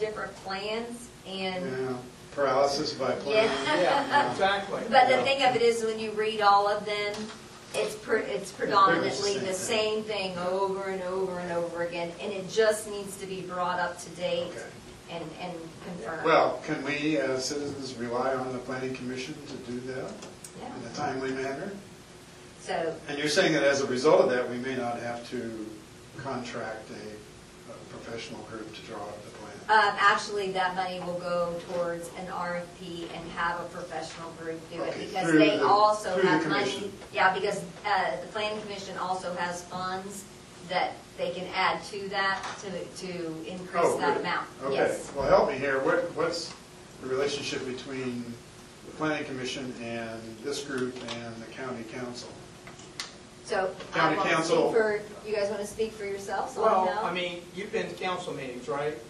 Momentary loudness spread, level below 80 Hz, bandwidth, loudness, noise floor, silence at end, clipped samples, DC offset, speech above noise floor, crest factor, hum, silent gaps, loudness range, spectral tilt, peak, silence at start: 17 LU; -62 dBFS; 13 kHz; -29 LUFS; -49 dBFS; 0 s; under 0.1%; under 0.1%; 20 dB; 22 dB; none; none; 10 LU; -4 dB/octave; -6 dBFS; 0 s